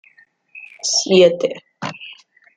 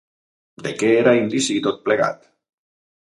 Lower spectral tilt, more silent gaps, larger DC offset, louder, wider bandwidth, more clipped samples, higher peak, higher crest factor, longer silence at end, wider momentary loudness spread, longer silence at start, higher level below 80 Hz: about the same, -3.5 dB/octave vs -4.5 dB/octave; neither; neither; first, -15 LUFS vs -19 LUFS; second, 9.4 kHz vs 11.5 kHz; neither; about the same, -2 dBFS vs -2 dBFS; about the same, 18 dB vs 20 dB; second, 0.45 s vs 0.9 s; first, 25 LU vs 15 LU; about the same, 0.55 s vs 0.6 s; about the same, -64 dBFS vs -66 dBFS